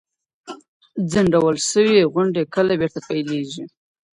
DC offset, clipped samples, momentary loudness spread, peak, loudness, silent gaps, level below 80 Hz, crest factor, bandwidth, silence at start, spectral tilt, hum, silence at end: under 0.1%; under 0.1%; 23 LU; -4 dBFS; -19 LUFS; 0.68-0.80 s; -54 dBFS; 16 dB; 11.5 kHz; 0.45 s; -5 dB/octave; none; 0.45 s